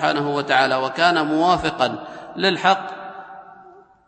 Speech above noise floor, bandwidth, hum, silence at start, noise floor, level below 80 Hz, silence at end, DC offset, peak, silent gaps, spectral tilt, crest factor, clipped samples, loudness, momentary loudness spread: 28 dB; 8.8 kHz; none; 0 s; -47 dBFS; -54 dBFS; 0.35 s; under 0.1%; -2 dBFS; none; -4.5 dB/octave; 18 dB; under 0.1%; -19 LUFS; 17 LU